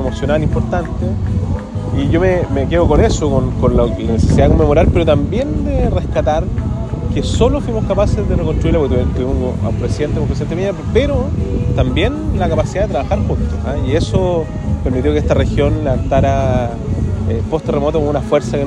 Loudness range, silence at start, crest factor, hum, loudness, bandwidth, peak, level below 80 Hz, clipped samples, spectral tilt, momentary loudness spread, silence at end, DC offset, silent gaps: 3 LU; 0 s; 14 dB; none; -15 LUFS; 10 kHz; 0 dBFS; -22 dBFS; under 0.1%; -7.5 dB/octave; 7 LU; 0 s; under 0.1%; none